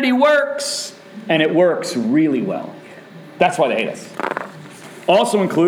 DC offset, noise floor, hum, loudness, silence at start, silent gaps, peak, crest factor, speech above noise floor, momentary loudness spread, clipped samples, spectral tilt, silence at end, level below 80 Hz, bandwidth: under 0.1%; -38 dBFS; none; -18 LUFS; 0 s; none; -2 dBFS; 16 dB; 22 dB; 20 LU; under 0.1%; -4.5 dB/octave; 0 s; -68 dBFS; 16.5 kHz